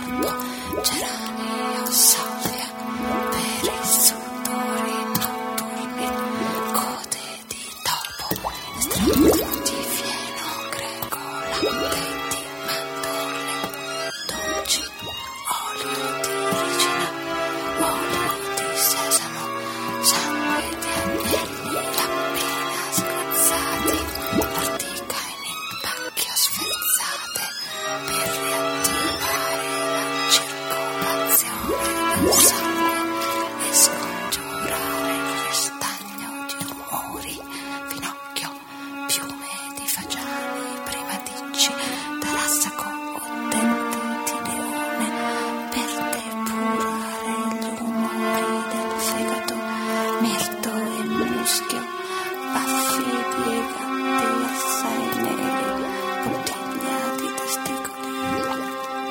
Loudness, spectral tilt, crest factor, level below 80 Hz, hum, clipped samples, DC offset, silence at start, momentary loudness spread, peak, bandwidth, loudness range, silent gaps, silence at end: -23 LUFS; -2 dB/octave; 24 dB; -50 dBFS; none; under 0.1%; under 0.1%; 0 s; 10 LU; 0 dBFS; 17 kHz; 6 LU; none; 0 s